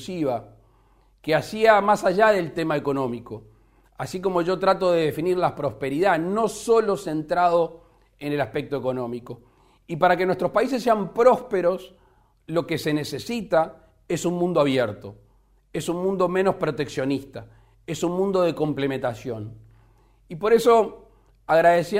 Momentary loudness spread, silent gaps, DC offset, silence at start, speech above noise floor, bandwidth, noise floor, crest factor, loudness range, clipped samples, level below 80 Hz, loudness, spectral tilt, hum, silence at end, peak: 16 LU; none; under 0.1%; 0 s; 37 dB; 16 kHz; -59 dBFS; 20 dB; 4 LU; under 0.1%; -56 dBFS; -23 LUFS; -5.5 dB/octave; none; 0 s; -4 dBFS